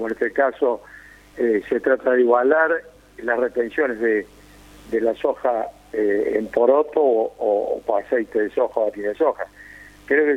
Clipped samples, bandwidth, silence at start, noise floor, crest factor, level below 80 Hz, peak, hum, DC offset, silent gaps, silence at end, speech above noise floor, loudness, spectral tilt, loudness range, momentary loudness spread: under 0.1%; 10.5 kHz; 0 s; -46 dBFS; 18 dB; -56 dBFS; -4 dBFS; 50 Hz at -55 dBFS; under 0.1%; none; 0 s; 26 dB; -21 LUFS; -6.5 dB/octave; 3 LU; 8 LU